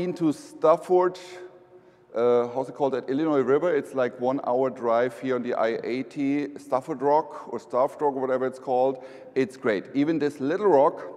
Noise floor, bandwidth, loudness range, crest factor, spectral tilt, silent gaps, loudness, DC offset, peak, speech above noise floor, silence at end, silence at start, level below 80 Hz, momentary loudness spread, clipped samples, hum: -53 dBFS; 12.5 kHz; 2 LU; 18 dB; -7 dB/octave; none; -25 LUFS; under 0.1%; -8 dBFS; 29 dB; 0 s; 0 s; -76 dBFS; 8 LU; under 0.1%; none